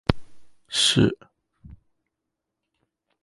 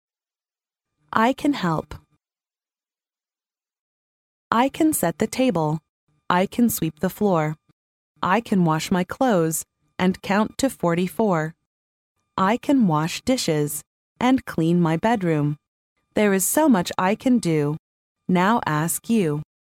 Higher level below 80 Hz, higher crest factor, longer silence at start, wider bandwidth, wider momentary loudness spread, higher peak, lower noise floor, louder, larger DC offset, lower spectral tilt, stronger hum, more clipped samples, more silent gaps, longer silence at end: first, -44 dBFS vs -56 dBFS; first, 28 dB vs 20 dB; second, 0.1 s vs 1.15 s; second, 11.5 kHz vs 17 kHz; first, 16 LU vs 9 LU; about the same, 0 dBFS vs -2 dBFS; second, -83 dBFS vs under -90 dBFS; about the same, -22 LUFS vs -22 LUFS; neither; second, -4 dB/octave vs -5.5 dB/octave; neither; neither; second, none vs 3.79-4.51 s, 5.89-6.07 s, 7.73-8.15 s, 11.66-12.15 s, 13.87-14.16 s, 15.68-15.96 s, 17.79-18.15 s; first, 1.5 s vs 0.25 s